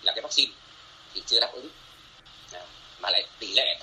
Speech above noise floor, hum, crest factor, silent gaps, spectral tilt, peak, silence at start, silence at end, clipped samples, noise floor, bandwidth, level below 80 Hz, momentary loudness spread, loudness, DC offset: 24 dB; none; 24 dB; none; 0.5 dB/octave; -4 dBFS; 0 s; 0 s; under 0.1%; -51 dBFS; 13 kHz; -64 dBFS; 21 LU; -24 LUFS; under 0.1%